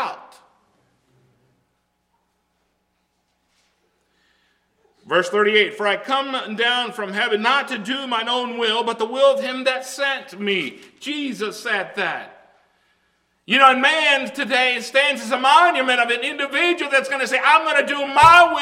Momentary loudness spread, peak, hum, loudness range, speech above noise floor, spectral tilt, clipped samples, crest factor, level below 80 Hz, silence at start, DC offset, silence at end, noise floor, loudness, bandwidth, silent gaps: 12 LU; 0 dBFS; 60 Hz at -70 dBFS; 9 LU; 51 dB; -2.5 dB/octave; under 0.1%; 20 dB; -58 dBFS; 0 s; under 0.1%; 0 s; -70 dBFS; -18 LUFS; 16 kHz; none